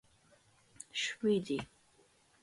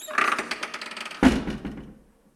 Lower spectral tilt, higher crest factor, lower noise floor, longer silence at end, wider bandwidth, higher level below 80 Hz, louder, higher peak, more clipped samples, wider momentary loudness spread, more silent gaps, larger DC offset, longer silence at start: about the same, -4 dB/octave vs -4.5 dB/octave; second, 18 dB vs 24 dB; first, -69 dBFS vs -50 dBFS; first, 0.8 s vs 0.45 s; second, 11.5 kHz vs 15 kHz; second, -72 dBFS vs -42 dBFS; second, -36 LUFS vs -25 LUFS; second, -20 dBFS vs -2 dBFS; neither; first, 19 LU vs 15 LU; neither; neither; first, 0.95 s vs 0 s